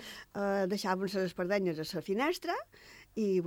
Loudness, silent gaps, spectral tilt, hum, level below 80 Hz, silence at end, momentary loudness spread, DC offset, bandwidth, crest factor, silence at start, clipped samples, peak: -34 LUFS; none; -5.5 dB/octave; none; -68 dBFS; 0 s; 11 LU; under 0.1%; 17.5 kHz; 16 dB; 0 s; under 0.1%; -18 dBFS